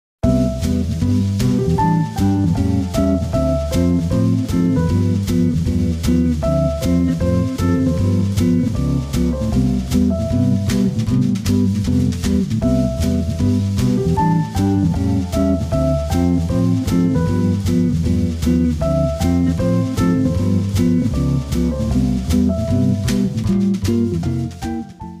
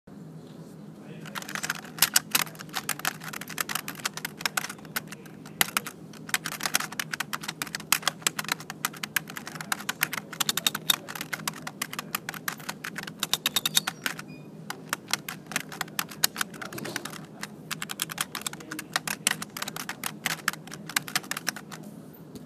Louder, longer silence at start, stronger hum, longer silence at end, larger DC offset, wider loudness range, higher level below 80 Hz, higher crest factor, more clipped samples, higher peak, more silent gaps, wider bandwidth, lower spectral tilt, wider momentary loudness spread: first, -18 LUFS vs -30 LUFS; first, 0.25 s vs 0.05 s; neither; about the same, 0 s vs 0 s; neither; second, 0 LU vs 4 LU; first, -28 dBFS vs -70 dBFS; second, 14 dB vs 32 dB; neither; about the same, -2 dBFS vs 0 dBFS; neither; about the same, 16 kHz vs 15.5 kHz; first, -7.5 dB/octave vs -1 dB/octave; second, 2 LU vs 16 LU